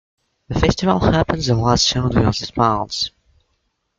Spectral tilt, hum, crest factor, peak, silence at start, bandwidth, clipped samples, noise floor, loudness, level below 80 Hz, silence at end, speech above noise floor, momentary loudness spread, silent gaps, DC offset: -5 dB/octave; none; 18 dB; -2 dBFS; 0.5 s; 7.8 kHz; under 0.1%; -69 dBFS; -18 LUFS; -34 dBFS; 0.9 s; 52 dB; 8 LU; none; under 0.1%